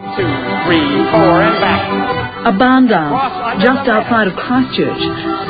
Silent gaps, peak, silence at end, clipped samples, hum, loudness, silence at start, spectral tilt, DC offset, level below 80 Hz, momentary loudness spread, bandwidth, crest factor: none; 0 dBFS; 0 s; under 0.1%; none; -13 LUFS; 0 s; -9.5 dB/octave; under 0.1%; -40 dBFS; 7 LU; 5 kHz; 12 dB